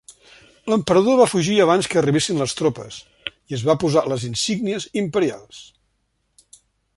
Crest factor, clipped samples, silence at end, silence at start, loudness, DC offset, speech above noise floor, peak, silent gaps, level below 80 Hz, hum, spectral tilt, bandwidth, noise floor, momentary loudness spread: 18 dB; under 0.1%; 1.35 s; 0.1 s; -19 LUFS; under 0.1%; 50 dB; -2 dBFS; none; -56 dBFS; none; -5 dB/octave; 12 kHz; -69 dBFS; 17 LU